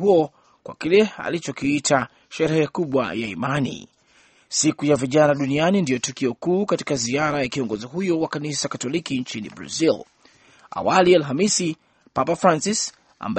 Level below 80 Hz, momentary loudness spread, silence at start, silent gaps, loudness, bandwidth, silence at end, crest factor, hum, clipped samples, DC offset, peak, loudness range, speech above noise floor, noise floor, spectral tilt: -58 dBFS; 11 LU; 0 s; none; -21 LUFS; 8.8 kHz; 0 s; 20 dB; none; under 0.1%; under 0.1%; -2 dBFS; 3 LU; 36 dB; -57 dBFS; -4.5 dB/octave